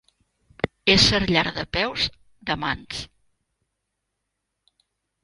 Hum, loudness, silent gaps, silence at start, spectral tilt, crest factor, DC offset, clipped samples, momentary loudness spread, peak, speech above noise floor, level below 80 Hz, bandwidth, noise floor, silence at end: none; -21 LUFS; none; 0.65 s; -3.5 dB/octave; 24 dB; under 0.1%; under 0.1%; 18 LU; -2 dBFS; 57 dB; -44 dBFS; 11.5 kHz; -80 dBFS; 2.2 s